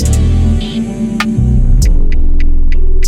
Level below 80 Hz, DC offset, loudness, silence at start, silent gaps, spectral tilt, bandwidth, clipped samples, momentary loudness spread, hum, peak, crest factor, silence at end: -8 dBFS; under 0.1%; -14 LUFS; 0 s; none; -6 dB/octave; 10.5 kHz; under 0.1%; 5 LU; none; -2 dBFS; 6 dB; 0 s